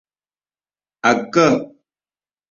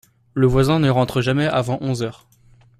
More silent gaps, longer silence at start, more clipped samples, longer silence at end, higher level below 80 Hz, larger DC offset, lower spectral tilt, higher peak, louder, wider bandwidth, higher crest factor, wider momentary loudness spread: neither; first, 1.05 s vs 0.35 s; neither; first, 0.85 s vs 0.65 s; second, -60 dBFS vs -40 dBFS; neither; second, -5 dB/octave vs -7 dB/octave; about the same, -2 dBFS vs -4 dBFS; about the same, -17 LUFS vs -19 LUFS; second, 7.6 kHz vs 14 kHz; about the same, 20 dB vs 16 dB; about the same, 9 LU vs 9 LU